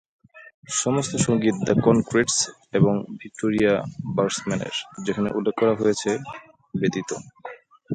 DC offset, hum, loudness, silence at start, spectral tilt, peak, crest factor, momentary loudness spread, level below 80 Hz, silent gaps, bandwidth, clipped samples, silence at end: under 0.1%; none; -23 LUFS; 0.35 s; -4.5 dB/octave; -4 dBFS; 18 dB; 14 LU; -56 dBFS; 0.54-0.63 s; 9.6 kHz; under 0.1%; 0 s